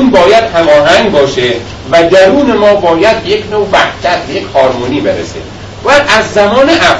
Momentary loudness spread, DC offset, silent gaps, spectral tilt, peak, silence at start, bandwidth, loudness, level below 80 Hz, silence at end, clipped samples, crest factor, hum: 9 LU; under 0.1%; none; -4.5 dB/octave; 0 dBFS; 0 s; 11 kHz; -8 LUFS; -34 dBFS; 0 s; 2%; 8 dB; none